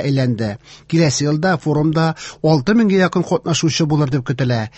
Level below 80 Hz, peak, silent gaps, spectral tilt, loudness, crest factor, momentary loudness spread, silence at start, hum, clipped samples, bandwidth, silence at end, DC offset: -48 dBFS; -2 dBFS; none; -5.5 dB/octave; -17 LUFS; 14 dB; 6 LU; 0 s; none; under 0.1%; 8.4 kHz; 0.1 s; under 0.1%